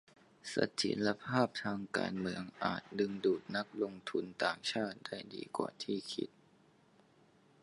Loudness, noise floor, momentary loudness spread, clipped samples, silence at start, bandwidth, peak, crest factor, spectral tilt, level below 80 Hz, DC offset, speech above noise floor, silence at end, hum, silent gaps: -38 LUFS; -67 dBFS; 8 LU; under 0.1%; 0.45 s; 11.5 kHz; -16 dBFS; 24 dB; -4.5 dB/octave; -74 dBFS; under 0.1%; 30 dB; 1.35 s; none; none